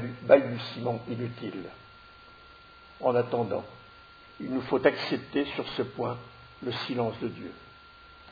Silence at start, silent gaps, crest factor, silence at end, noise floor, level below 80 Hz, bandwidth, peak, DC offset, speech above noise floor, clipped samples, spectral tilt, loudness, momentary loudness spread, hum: 0 s; none; 26 dB; 0 s; -52 dBFS; -64 dBFS; 5 kHz; -4 dBFS; under 0.1%; 24 dB; under 0.1%; -7.5 dB/octave; -29 LUFS; 26 LU; none